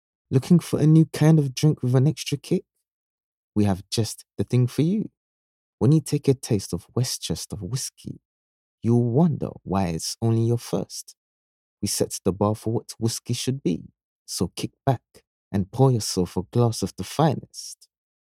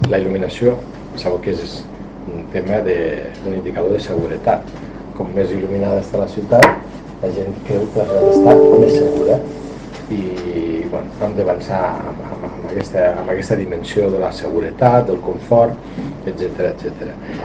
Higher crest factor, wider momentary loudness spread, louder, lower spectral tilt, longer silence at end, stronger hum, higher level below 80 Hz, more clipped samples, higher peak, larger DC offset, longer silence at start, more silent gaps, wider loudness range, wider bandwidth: about the same, 20 dB vs 16 dB; second, 11 LU vs 17 LU; second, -24 LUFS vs -17 LUFS; about the same, -6.5 dB/octave vs -7 dB/octave; first, 0.6 s vs 0 s; neither; second, -56 dBFS vs -40 dBFS; second, under 0.1% vs 0.1%; second, -4 dBFS vs 0 dBFS; neither; first, 0.3 s vs 0 s; first, 2.91-3.52 s, 5.17-5.78 s, 8.25-8.78 s, 11.17-11.77 s, 14.04-14.26 s, 15.27-15.51 s vs none; second, 5 LU vs 8 LU; first, 15.5 kHz vs 9.6 kHz